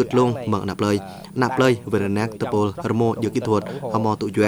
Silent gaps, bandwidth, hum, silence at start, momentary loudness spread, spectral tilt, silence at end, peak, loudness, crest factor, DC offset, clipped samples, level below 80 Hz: none; over 20 kHz; none; 0 s; 5 LU; -6.5 dB/octave; 0 s; -4 dBFS; -22 LUFS; 18 dB; under 0.1%; under 0.1%; -54 dBFS